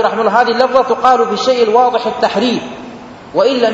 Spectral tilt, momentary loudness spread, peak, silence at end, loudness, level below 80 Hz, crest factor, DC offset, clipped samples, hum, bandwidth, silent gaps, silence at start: -4.5 dB/octave; 15 LU; 0 dBFS; 0 s; -12 LUFS; -52 dBFS; 12 dB; under 0.1%; 0.1%; none; 8 kHz; none; 0 s